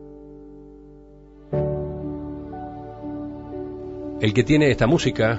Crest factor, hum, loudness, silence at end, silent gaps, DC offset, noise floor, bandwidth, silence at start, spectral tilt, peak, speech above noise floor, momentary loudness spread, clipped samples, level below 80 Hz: 20 dB; 50 Hz at -50 dBFS; -24 LUFS; 0 s; none; under 0.1%; -46 dBFS; 8 kHz; 0 s; -6.5 dB/octave; -4 dBFS; 28 dB; 25 LU; under 0.1%; -42 dBFS